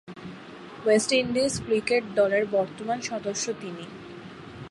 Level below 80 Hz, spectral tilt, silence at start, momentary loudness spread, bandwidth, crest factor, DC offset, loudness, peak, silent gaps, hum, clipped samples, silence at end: -60 dBFS; -3.5 dB/octave; 0.05 s; 19 LU; 11.5 kHz; 18 dB; under 0.1%; -25 LUFS; -8 dBFS; none; none; under 0.1%; 0 s